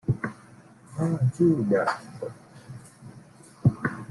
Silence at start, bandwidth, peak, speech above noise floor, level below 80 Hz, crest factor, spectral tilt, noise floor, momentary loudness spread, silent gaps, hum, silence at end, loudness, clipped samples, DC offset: 0.05 s; 11.5 kHz; -8 dBFS; 27 dB; -56 dBFS; 20 dB; -8.5 dB/octave; -51 dBFS; 24 LU; none; none; 0 s; -26 LUFS; under 0.1%; under 0.1%